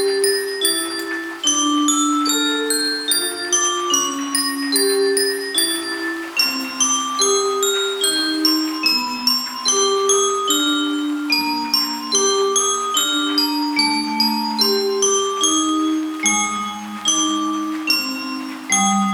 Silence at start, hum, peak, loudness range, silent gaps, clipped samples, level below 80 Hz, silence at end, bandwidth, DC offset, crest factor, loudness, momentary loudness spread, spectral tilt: 0 s; none; -2 dBFS; 1 LU; none; under 0.1%; -66 dBFS; 0 s; 19.5 kHz; under 0.1%; 16 dB; -17 LUFS; 5 LU; -1 dB/octave